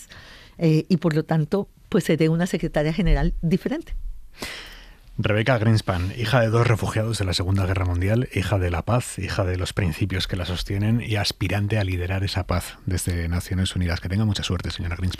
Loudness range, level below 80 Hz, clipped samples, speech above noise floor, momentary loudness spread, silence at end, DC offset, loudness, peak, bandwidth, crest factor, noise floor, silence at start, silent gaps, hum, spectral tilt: 3 LU; -34 dBFS; under 0.1%; 22 dB; 9 LU; 0 s; under 0.1%; -23 LUFS; -4 dBFS; 15 kHz; 18 dB; -45 dBFS; 0 s; none; none; -6 dB/octave